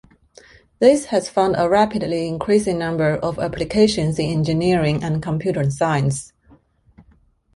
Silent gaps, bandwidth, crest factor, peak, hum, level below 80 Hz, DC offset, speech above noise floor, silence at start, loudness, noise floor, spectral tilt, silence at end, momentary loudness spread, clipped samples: none; 11.5 kHz; 18 dB; -2 dBFS; none; -46 dBFS; under 0.1%; 38 dB; 0.8 s; -19 LUFS; -56 dBFS; -6 dB/octave; 0.55 s; 7 LU; under 0.1%